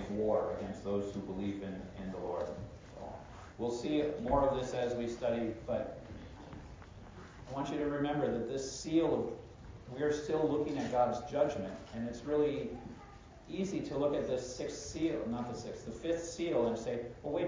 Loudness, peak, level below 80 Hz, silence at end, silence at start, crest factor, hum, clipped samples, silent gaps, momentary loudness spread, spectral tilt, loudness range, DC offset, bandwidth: -36 LUFS; -18 dBFS; -56 dBFS; 0 s; 0 s; 20 dB; none; under 0.1%; none; 17 LU; -6 dB/octave; 5 LU; under 0.1%; 7.6 kHz